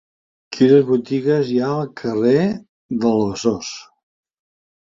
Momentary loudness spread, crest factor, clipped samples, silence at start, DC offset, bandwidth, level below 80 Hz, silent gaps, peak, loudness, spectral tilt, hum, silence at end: 16 LU; 18 dB; under 0.1%; 0.5 s; under 0.1%; 7.6 kHz; -56 dBFS; 2.69-2.89 s; -2 dBFS; -18 LUFS; -6.5 dB/octave; none; 1.05 s